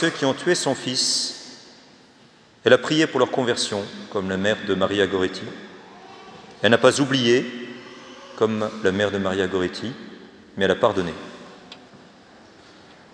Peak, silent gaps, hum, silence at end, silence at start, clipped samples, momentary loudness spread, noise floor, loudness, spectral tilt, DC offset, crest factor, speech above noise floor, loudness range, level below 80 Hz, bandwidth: 0 dBFS; none; none; 1.15 s; 0 s; under 0.1%; 24 LU; -52 dBFS; -21 LUFS; -4 dB/octave; under 0.1%; 24 dB; 31 dB; 4 LU; -64 dBFS; 10.5 kHz